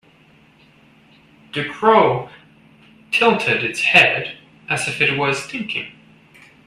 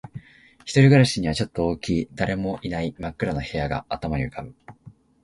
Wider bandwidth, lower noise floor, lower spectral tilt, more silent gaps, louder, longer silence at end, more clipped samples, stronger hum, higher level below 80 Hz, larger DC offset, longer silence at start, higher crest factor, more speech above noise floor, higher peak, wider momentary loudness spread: first, 14.5 kHz vs 11.5 kHz; about the same, -52 dBFS vs -50 dBFS; second, -4 dB/octave vs -6.5 dB/octave; neither; first, -17 LUFS vs -23 LUFS; first, 0.75 s vs 0.35 s; neither; neither; second, -60 dBFS vs -42 dBFS; neither; first, 1.55 s vs 0.05 s; about the same, 20 dB vs 18 dB; first, 34 dB vs 27 dB; first, 0 dBFS vs -4 dBFS; second, 17 LU vs 20 LU